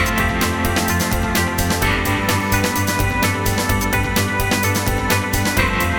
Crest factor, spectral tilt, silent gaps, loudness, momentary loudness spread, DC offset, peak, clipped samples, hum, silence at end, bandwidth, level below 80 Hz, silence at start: 16 dB; -4 dB/octave; none; -18 LUFS; 1 LU; 0.1%; -2 dBFS; under 0.1%; none; 0 s; over 20 kHz; -28 dBFS; 0 s